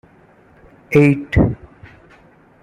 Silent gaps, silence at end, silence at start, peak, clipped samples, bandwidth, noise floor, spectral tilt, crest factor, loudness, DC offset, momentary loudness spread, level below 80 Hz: none; 1.05 s; 0.9 s; -2 dBFS; under 0.1%; 13.5 kHz; -49 dBFS; -8.5 dB/octave; 18 dB; -15 LUFS; under 0.1%; 8 LU; -34 dBFS